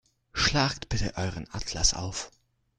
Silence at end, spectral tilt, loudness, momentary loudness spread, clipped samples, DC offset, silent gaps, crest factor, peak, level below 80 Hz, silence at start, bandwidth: 0.5 s; -3 dB/octave; -28 LUFS; 13 LU; under 0.1%; under 0.1%; none; 22 dB; -8 dBFS; -40 dBFS; 0.35 s; 11 kHz